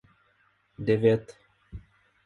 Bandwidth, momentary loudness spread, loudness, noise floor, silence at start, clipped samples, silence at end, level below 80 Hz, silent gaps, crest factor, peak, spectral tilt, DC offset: 8.4 kHz; 25 LU; -26 LUFS; -67 dBFS; 0.8 s; under 0.1%; 0.5 s; -56 dBFS; none; 22 dB; -8 dBFS; -8.5 dB/octave; under 0.1%